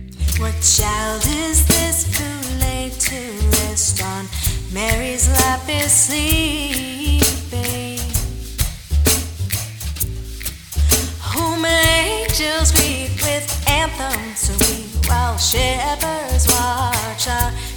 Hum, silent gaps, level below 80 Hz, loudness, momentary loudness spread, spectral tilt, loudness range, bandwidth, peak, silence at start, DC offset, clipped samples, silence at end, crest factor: none; none; -24 dBFS; -17 LUFS; 9 LU; -3 dB/octave; 3 LU; 19.5 kHz; 0 dBFS; 0 s; under 0.1%; under 0.1%; 0 s; 18 dB